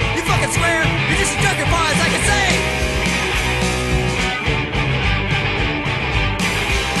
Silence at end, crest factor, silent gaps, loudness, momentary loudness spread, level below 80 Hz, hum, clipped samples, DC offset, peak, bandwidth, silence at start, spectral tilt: 0 s; 16 dB; none; -17 LUFS; 4 LU; -26 dBFS; none; under 0.1%; under 0.1%; -2 dBFS; 13 kHz; 0 s; -4 dB/octave